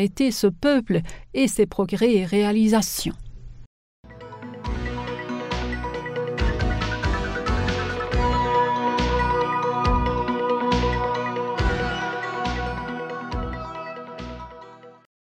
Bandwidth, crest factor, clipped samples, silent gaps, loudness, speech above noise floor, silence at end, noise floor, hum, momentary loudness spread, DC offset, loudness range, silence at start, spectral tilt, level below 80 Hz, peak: 16 kHz; 18 dB; under 0.1%; 3.66-4.03 s; -24 LUFS; 23 dB; 0.35 s; -44 dBFS; none; 14 LU; under 0.1%; 8 LU; 0 s; -5.5 dB/octave; -32 dBFS; -6 dBFS